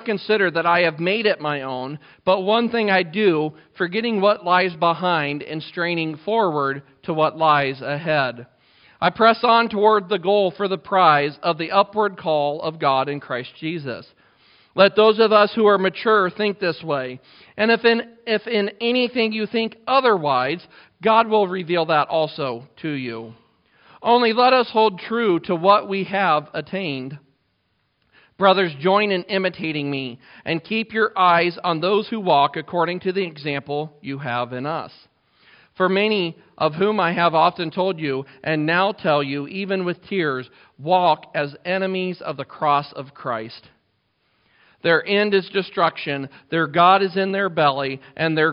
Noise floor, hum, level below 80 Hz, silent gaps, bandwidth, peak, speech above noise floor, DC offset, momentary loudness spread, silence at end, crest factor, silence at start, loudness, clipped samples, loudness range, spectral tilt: -69 dBFS; none; -68 dBFS; none; 5.4 kHz; 0 dBFS; 49 dB; under 0.1%; 12 LU; 0 s; 20 dB; 0 s; -20 LUFS; under 0.1%; 5 LU; -3 dB/octave